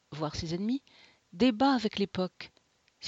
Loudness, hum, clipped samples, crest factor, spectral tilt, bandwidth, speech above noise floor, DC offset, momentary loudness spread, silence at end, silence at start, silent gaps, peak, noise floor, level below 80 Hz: -30 LUFS; none; under 0.1%; 18 dB; -5.5 dB/octave; 7.8 kHz; 36 dB; under 0.1%; 11 LU; 0 s; 0.1 s; none; -14 dBFS; -66 dBFS; -60 dBFS